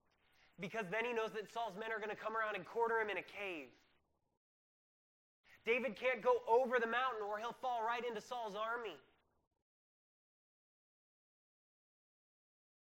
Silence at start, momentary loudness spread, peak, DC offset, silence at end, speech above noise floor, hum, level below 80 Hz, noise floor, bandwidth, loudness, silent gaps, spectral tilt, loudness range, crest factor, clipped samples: 0.6 s; 11 LU; -22 dBFS; under 0.1%; 3.9 s; 40 dB; none; -84 dBFS; -79 dBFS; 16 kHz; -40 LUFS; 4.37-5.44 s; -4 dB/octave; 9 LU; 22 dB; under 0.1%